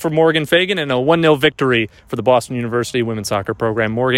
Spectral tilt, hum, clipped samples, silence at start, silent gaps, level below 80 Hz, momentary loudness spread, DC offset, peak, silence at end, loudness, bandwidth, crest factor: -5 dB/octave; none; under 0.1%; 0 s; none; -50 dBFS; 7 LU; under 0.1%; 0 dBFS; 0 s; -16 LUFS; 16 kHz; 16 dB